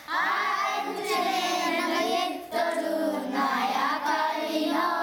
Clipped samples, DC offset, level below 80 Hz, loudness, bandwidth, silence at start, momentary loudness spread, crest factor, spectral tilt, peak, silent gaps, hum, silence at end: under 0.1%; under 0.1%; -74 dBFS; -27 LUFS; over 20 kHz; 0 s; 3 LU; 14 dB; -2.5 dB/octave; -12 dBFS; none; none; 0 s